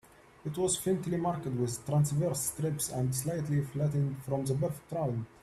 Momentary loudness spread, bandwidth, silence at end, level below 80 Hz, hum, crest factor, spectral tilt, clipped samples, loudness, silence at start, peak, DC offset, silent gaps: 5 LU; 14 kHz; 0.15 s; -60 dBFS; none; 16 dB; -6 dB/octave; under 0.1%; -32 LUFS; 0.45 s; -16 dBFS; under 0.1%; none